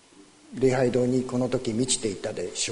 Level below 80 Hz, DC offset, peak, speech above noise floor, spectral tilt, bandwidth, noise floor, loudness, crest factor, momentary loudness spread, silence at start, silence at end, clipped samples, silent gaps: -54 dBFS; under 0.1%; -10 dBFS; 28 dB; -4.5 dB/octave; 11 kHz; -53 dBFS; -26 LUFS; 16 dB; 8 LU; 0.2 s; 0 s; under 0.1%; none